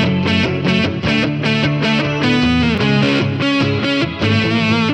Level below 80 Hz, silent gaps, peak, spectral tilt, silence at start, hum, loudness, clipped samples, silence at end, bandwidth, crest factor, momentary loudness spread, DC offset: -38 dBFS; none; -2 dBFS; -6 dB/octave; 0 s; none; -15 LUFS; under 0.1%; 0 s; 9.4 kHz; 14 dB; 2 LU; under 0.1%